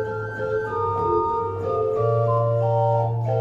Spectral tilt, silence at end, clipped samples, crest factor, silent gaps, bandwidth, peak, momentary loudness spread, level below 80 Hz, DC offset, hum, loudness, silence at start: -9.5 dB/octave; 0 s; under 0.1%; 12 dB; none; 5.4 kHz; -10 dBFS; 5 LU; -50 dBFS; under 0.1%; none; -23 LUFS; 0 s